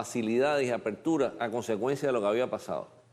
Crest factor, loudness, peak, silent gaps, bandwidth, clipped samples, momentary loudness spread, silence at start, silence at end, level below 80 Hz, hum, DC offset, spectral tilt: 14 dB; -30 LUFS; -14 dBFS; none; 14.5 kHz; under 0.1%; 7 LU; 0 s; 0.25 s; -70 dBFS; none; under 0.1%; -5.5 dB/octave